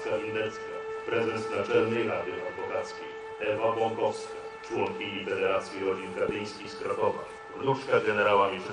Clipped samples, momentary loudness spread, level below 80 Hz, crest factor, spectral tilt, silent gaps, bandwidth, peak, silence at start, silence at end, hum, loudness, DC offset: under 0.1%; 12 LU; -66 dBFS; 18 dB; -5 dB/octave; none; 10.5 kHz; -12 dBFS; 0 s; 0 s; none; -30 LUFS; under 0.1%